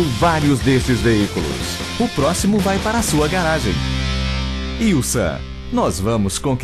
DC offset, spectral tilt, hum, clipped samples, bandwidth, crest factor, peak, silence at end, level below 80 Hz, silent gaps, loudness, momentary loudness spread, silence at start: under 0.1%; -5 dB/octave; none; under 0.1%; 13.5 kHz; 10 dB; -6 dBFS; 0 s; -28 dBFS; none; -18 LUFS; 7 LU; 0 s